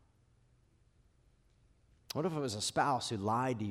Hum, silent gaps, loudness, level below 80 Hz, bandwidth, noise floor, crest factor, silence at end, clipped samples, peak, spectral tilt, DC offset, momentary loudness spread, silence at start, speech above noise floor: none; none; -35 LUFS; -70 dBFS; 15.5 kHz; -69 dBFS; 20 dB; 0 s; under 0.1%; -18 dBFS; -4.5 dB/octave; under 0.1%; 5 LU; 2.15 s; 35 dB